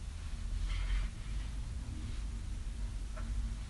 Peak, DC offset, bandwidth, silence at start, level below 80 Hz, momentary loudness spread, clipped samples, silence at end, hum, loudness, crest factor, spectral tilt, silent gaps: -26 dBFS; under 0.1%; 11.5 kHz; 0 s; -38 dBFS; 5 LU; under 0.1%; 0 s; none; -42 LUFS; 12 dB; -5 dB/octave; none